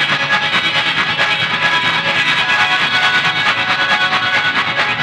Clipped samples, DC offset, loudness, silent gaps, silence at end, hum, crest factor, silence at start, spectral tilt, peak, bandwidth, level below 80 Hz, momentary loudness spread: under 0.1%; under 0.1%; -13 LUFS; none; 0 s; none; 12 dB; 0 s; -2.5 dB/octave; -2 dBFS; 16 kHz; -54 dBFS; 2 LU